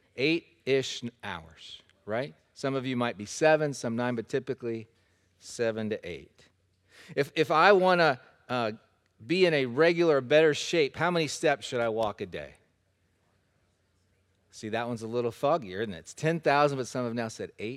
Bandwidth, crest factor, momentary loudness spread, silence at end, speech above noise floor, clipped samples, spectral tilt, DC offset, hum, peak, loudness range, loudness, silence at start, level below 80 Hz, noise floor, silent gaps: 14 kHz; 24 dB; 16 LU; 0 s; 44 dB; under 0.1%; -5 dB/octave; under 0.1%; none; -4 dBFS; 10 LU; -28 LUFS; 0.15 s; -68 dBFS; -72 dBFS; none